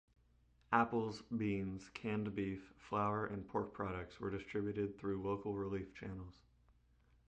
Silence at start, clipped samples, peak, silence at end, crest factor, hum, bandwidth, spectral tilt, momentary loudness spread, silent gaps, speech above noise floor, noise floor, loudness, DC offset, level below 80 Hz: 0.7 s; under 0.1%; -16 dBFS; 1 s; 24 dB; none; 9 kHz; -7.5 dB/octave; 9 LU; none; 31 dB; -72 dBFS; -41 LUFS; under 0.1%; -64 dBFS